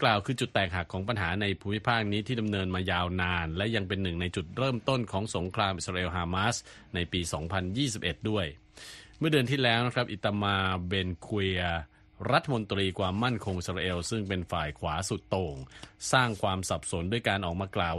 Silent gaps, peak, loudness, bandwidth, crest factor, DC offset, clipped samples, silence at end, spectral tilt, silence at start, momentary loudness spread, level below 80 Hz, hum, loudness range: none; -8 dBFS; -30 LUFS; 12.5 kHz; 22 dB; under 0.1%; under 0.1%; 0 s; -5 dB/octave; 0 s; 6 LU; -50 dBFS; none; 2 LU